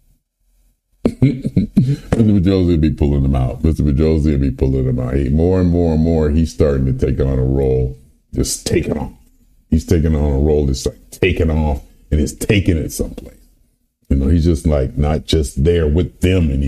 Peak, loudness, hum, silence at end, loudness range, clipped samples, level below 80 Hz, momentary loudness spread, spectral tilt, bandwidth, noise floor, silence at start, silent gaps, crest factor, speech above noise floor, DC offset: 0 dBFS; -16 LUFS; none; 0 s; 3 LU; under 0.1%; -24 dBFS; 7 LU; -7 dB/octave; 14 kHz; -59 dBFS; 1.05 s; none; 14 dB; 44 dB; 0.1%